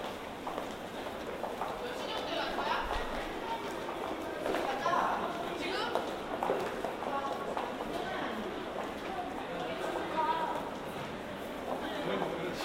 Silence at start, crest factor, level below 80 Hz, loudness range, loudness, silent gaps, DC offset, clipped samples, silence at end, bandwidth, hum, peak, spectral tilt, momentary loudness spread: 0 s; 22 dB; -54 dBFS; 3 LU; -36 LUFS; none; under 0.1%; under 0.1%; 0 s; 16 kHz; none; -14 dBFS; -4.5 dB/octave; 7 LU